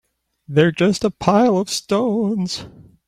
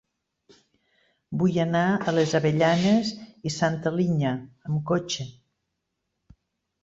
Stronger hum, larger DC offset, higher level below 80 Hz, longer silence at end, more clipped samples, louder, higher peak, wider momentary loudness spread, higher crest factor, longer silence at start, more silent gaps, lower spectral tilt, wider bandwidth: neither; neither; first, -52 dBFS vs -62 dBFS; second, 0.25 s vs 1.5 s; neither; first, -18 LUFS vs -25 LUFS; first, -2 dBFS vs -8 dBFS; second, 7 LU vs 11 LU; about the same, 16 dB vs 18 dB; second, 0.5 s vs 1.3 s; neither; about the same, -5.5 dB/octave vs -6 dB/octave; first, 15 kHz vs 8 kHz